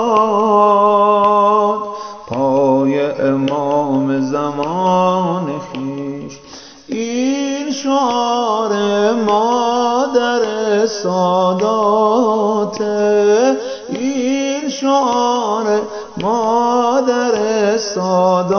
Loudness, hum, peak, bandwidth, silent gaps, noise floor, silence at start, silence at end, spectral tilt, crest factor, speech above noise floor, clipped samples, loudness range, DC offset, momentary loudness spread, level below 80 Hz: -15 LUFS; none; 0 dBFS; 6.8 kHz; none; -37 dBFS; 0 s; 0 s; -5 dB/octave; 14 dB; 23 dB; under 0.1%; 4 LU; under 0.1%; 11 LU; -60 dBFS